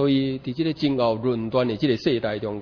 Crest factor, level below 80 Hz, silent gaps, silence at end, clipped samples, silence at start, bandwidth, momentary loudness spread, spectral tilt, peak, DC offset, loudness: 14 dB; -54 dBFS; none; 0 s; under 0.1%; 0 s; 5.4 kHz; 4 LU; -8 dB/octave; -8 dBFS; under 0.1%; -24 LUFS